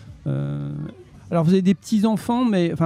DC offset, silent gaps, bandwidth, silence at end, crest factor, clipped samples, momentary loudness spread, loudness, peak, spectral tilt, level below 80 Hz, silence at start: under 0.1%; none; 13.5 kHz; 0 s; 14 dB; under 0.1%; 12 LU; -21 LUFS; -8 dBFS; -7.5 dB/octave; -52 dBFS; 0 s